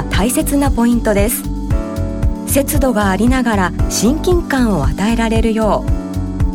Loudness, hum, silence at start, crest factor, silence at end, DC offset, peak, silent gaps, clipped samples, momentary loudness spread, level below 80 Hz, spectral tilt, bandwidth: -15 LUFS; none; 0 s; 12 dB; 0 s; under 0.1%; -4 dBFS; none; under 0.1%; 6 LU; -22 dBFS; -5.5 dB/octave; 18.5 kHz